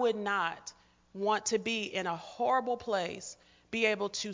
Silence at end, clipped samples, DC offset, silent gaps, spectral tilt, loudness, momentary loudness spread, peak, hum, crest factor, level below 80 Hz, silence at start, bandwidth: 0 s; under 0.1%; under 0.1%; none; -3 dB/octave; -32 LUFS; 14 LU; -14 dBFS; none; 20 dB; -70 dBFS; 0 s; 7.8 kHz